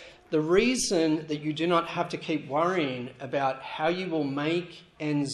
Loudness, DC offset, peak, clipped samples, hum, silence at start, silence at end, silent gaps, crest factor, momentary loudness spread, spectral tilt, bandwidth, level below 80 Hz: -28 LUFS; under 0.1%; -10 dBFS; under 0.1%; none; 0 s; 0 s; none; 18 dB; 8 LU; -4.5 dB/octave; 12.5 kHz; -60 dBFS